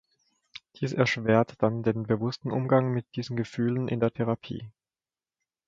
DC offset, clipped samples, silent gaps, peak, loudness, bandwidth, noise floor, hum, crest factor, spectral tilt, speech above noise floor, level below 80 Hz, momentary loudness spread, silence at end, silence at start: under 0.1%; under 0.1%; none; -8 dBFS; -27 LUFS; 7.6 kHz; under -90 dBFS; none; 22 dB; -7.5 dB/octave; over 63 dB; -62 dBFS; 14 LU; 1 s; 0.8 s